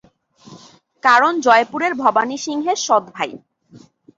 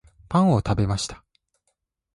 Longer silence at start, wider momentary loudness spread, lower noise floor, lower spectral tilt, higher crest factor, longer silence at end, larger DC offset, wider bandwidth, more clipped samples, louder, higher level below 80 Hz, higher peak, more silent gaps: first, 0.5 s vs 0.3 s; about the same, 11 LU vs 9 LU; second, -48 dBFS vs -75 dBFS; second, -2.5 dB/octave vs -6.5 dB/octave; about the same, 18 dB vs 16 dB; second, 0.4 s vs 1 s; neither; second, 7.8 kHz vs 11.5 kHz; neither; first, -17 LUFS vs -23 LUFS; second, -68 dBFS vs -42 dBFS; first, -2 dBFS vs -8 dBFS; neither